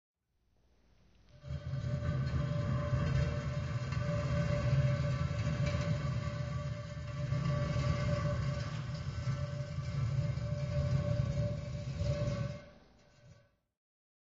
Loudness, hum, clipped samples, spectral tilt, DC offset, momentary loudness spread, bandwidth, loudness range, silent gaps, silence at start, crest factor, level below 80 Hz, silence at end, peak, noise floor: -36 LUFS; none; under 0.1%; -7 dB/octave; under 0.1%; 7 LU; 7.6 kHz; 3 LU; none; 1.35 s; 16 dB; -46 dBFS; 1.05 s; -20 dBFS; -75 dBFS